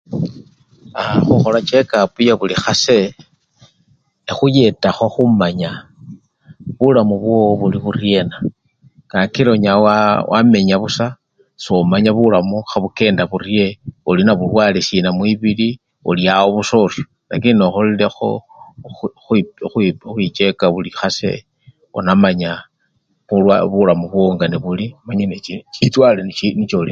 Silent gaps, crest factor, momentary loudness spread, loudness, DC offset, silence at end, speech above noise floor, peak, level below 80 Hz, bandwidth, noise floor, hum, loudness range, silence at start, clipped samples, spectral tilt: none; 16 dB; 12 LU; -15 LUFS; under 0.1%; 0 s; 50 dB; 0 dBFS; -46 dBFS; 7.6 kHz; -64 dBFS; none; 3 LU; 0.1 s; under 0.1%; -6 dB/octave